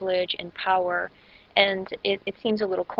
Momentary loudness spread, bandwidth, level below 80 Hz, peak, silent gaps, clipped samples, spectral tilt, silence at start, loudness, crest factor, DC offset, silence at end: 7 LU; 5.8 kHz; -64 dBFS; -6 dBFS; none; under 0.1%; -6.5 dB/octave; 0 s; -25 LUFS; 22 dB; under 0.1%; 0 s